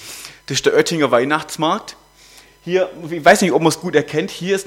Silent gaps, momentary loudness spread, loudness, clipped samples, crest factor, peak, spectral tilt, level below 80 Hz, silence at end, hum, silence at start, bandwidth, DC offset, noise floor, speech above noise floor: none; 13 LU; -17 LUFS; under 0.1%; 18 dB; 0 dBFS; -4 dB/octave; -56 dBFS; 0.05 s; none; 0 s; 17 kHz; under 0.1%; -46 dBFS; 30 dB